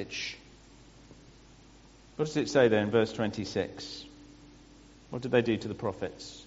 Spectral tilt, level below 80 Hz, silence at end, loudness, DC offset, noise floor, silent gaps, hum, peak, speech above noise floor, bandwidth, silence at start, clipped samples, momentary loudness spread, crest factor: -4.5 dB/octave; -60 dBFS; 0 s; -30 LUFS; under 0.1%; -56 dBFS; none; none; -10 dBFS; 26 dB; 8 kHz; 0 s; under 0.1%; 18 LU; 22 dB